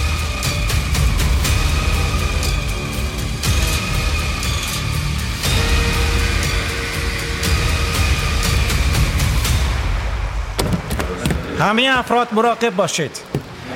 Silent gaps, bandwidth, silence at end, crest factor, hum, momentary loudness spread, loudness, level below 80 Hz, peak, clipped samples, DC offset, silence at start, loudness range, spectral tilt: none; 17 kHz; 0 s; 16 dB; none; 6 LU; -19 LUFS; -22 dBFS; -2 dBFS; under 0.1%; under 0.1%; 0 s; 2 LU; -4 dB/octave